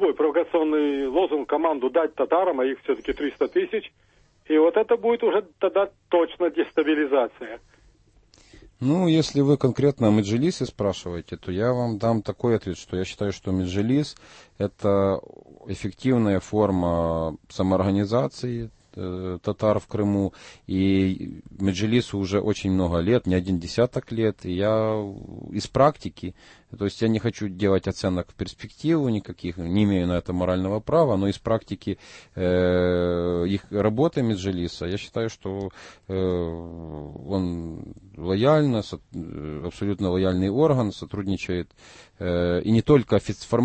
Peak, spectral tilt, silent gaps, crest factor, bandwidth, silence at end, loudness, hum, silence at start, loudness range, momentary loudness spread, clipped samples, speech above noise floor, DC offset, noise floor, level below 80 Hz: -6 dBFS; -7 dB/octave; none; 18 dB; 8.8 kHz; 0 s; -24 LUFS; none; 0 s; 3 LU; 13 LU; under 0.1%; 34 dB; under 0.1%; -57 dBFS; -48 dBFS